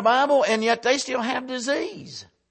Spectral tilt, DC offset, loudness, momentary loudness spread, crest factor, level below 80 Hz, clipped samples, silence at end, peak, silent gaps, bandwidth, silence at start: -2.5 dB/octave; under 0.1%; -22 LUFS; 18 LU; 16 dB; -70 dBFS; under 0.1%; 0.25 s; -8 dBFS; none; 8.8 kHz; 0 s